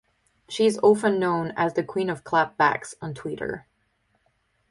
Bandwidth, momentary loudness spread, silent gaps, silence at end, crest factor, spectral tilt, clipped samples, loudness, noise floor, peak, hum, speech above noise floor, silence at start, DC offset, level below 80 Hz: 11.5 kHz; 14 LU; none; 1.1 s; 20 dB; -5.5 dB/octave; under 0.1%; -24 LUFS; -70 dBFS; -6 dBFS; none; 46 dB; 0.5 s; under 0.1%; -62 dBFS